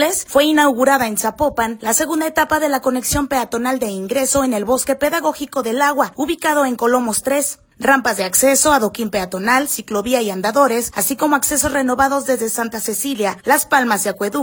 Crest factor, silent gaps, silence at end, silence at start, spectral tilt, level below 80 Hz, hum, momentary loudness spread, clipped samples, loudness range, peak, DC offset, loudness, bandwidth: 16 dB; none; 0 s; 0 s; -2.5 dB/octave; -46 dBFS; none; 7 LU; under 0.1%; 2 LU; 0 dBFS; under 0.1%; -16 LUFS; 19 kHz